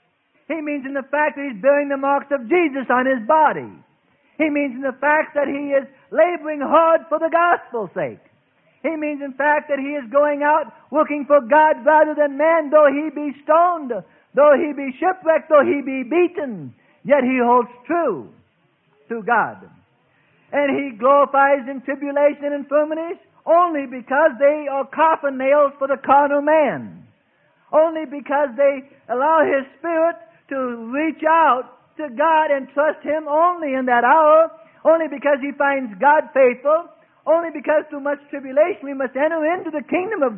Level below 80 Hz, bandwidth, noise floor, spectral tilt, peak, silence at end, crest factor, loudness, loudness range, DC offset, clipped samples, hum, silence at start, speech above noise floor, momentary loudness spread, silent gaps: -72 dBFS; 3.5 kHz; -62 dBFS; -10 dB/octave; -2 dBFS; 0 s; 16 dB; -18 LUFS; 4 LU; under 0.1%; under 0.1%; none; 0.5 s; 44 dB; 12 LU; none